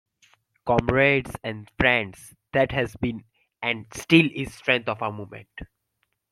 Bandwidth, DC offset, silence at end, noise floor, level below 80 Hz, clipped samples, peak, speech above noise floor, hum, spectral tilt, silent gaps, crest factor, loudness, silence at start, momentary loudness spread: 14.5 kHz; under 0.1%; 0.65 s; -75 dBFS; -48 dBFS; under 0.1%; -2 dBFS; 51 dB; none; -5.5 dB/octave; none; 22 dB; -23 LUFS; 0.65 s; 19 LU